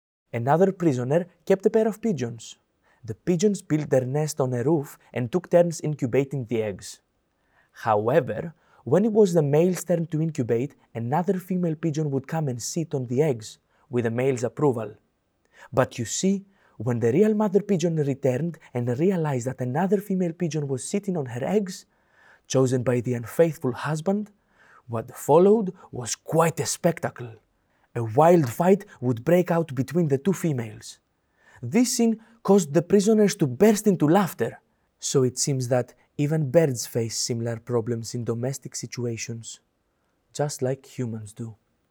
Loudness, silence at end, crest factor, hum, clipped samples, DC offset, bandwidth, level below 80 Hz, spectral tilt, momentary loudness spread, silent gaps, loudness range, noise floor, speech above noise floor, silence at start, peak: -24 LUFS; 0.4 s; 18 dB; none; under 0.1%; under 0.1%; over 20 kHz; -68 dBFS; -6 dB/octave; 13 LU; none; 5 LU; -71 dBFS; 48 dB; 0.35 s; -6 dBFS